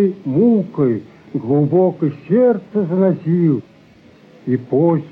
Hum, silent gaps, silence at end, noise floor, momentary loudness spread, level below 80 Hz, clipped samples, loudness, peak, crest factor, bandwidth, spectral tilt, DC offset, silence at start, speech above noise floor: none; none; 0 s; -46 dBFS; 9 LU; -62 dBFS; under 0.1%; -17 LUFS; -4 dBFS; 12 dB; 4.8 kHz; -12 dB/octave; under 0.1%; 0 s; 31 dB